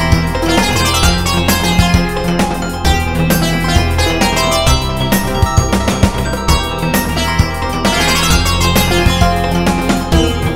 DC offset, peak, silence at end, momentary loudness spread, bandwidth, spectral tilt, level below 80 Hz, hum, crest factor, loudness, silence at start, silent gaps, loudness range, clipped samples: under 0.1%; 0 dBFS; 0 s; 4 LU; 16.5 kHz; -4.5 dB/octave; -20 dBFS; none; 12 dB; -13 LUFS; 0 s; none; 1 LU; under 0.1%